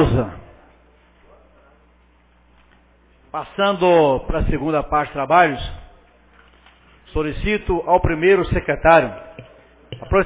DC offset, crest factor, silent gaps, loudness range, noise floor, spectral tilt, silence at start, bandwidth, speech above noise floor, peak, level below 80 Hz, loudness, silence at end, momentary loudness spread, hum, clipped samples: under 0.1%; 20 dB; none; 8 LU; -54 dBFS; -10 dB/octave; 0 s; 4 kHz; 37 dB; 0 dBFS; -34 dBFS; -18 LUFS; 0 s; 17 LU; none; under 0.1%